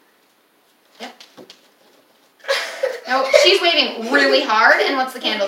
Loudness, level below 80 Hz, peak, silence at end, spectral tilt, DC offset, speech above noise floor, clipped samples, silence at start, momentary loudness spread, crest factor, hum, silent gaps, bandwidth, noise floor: -15 LUFS; -82 dBFS; 0 dBFS; 0 s; -1 dB/octave; under 0.1%; 42 dB; under 0.1%; 1 s; 23 LU; 18 dB; none; none; 16.5 kHz; -58 dBFS